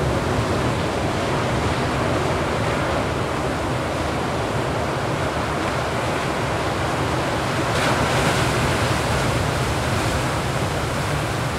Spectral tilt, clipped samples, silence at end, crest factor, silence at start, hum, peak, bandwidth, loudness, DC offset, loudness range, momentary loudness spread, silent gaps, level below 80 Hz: -5 dB/octave; under 0.1%; 0 s; 14 dB; 0 s; none; -6 dBFS; 16 kHz; -22 LUFS; under 0.1%; 2 LU; 4 LU; none; -36 dBFS